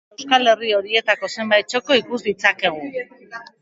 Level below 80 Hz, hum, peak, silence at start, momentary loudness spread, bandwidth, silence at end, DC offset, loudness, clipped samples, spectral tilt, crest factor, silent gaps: -68 dBFS; none; 0 dBFS; 0.2 s; 15 LU; 8 kHz; 0.2 s; under 0.1%; -18 LUFS; under 0.1%; -2.5 dB/octave; 20 dB; none